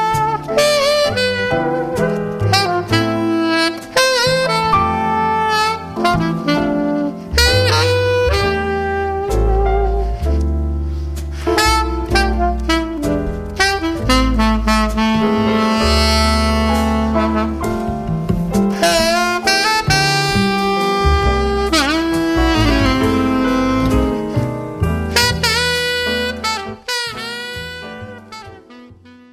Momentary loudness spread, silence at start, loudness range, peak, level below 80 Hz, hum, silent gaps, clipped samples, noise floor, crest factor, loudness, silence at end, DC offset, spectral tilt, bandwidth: 8 LU; 0 s; 3 LU; 0 dBFS; -24 dBFS; none; none; under 0.1%; -41 dBFS; 16 dB; -16 LUFS; 0.2 s; under 0.1%; -4.5 dB/octave; 15 kHz